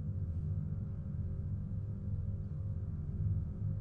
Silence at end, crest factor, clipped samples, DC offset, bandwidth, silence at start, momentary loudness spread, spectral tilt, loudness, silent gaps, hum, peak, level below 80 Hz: 0 s; 12 dB; under 0.1%; under 0.1%; 1.8 kHz; 0 s; 4 LU; -12 dB/octave; -40 LUFS; none; none; -24 dBFS; -46 dBFS